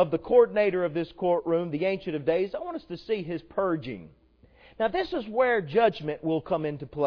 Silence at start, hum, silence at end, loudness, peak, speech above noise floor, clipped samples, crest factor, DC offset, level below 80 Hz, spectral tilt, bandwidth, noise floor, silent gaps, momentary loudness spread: 0 s; none; 0 s; -27 LUFS; -8 dBFS; 30 dB; under 0.1%; 18 dB; under 0.1%; -58 dBFS; -8.5 dB/octave; 5.4 kHz; -57 dBFS; none; 11 LU